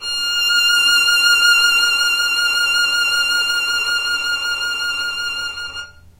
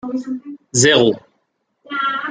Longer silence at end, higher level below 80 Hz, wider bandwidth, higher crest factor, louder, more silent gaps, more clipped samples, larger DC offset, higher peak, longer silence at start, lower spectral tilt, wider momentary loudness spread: first, 0.3 s vs 0 s; first, -50 dBFS vs -56 dBFS; first, 16 kHz vs 10 kHz; about the same, 14 dB vs 18 dB; about the same, -14 LUFS vs -16 LUFS; neither; neither; neither; about the same, -2 dBFS vs 0 dBFS; about the same, 0 s vs 0.05 s; second, 2.5 dB/octave vs -3 dB/octave; second, 10 LU vs 17 LU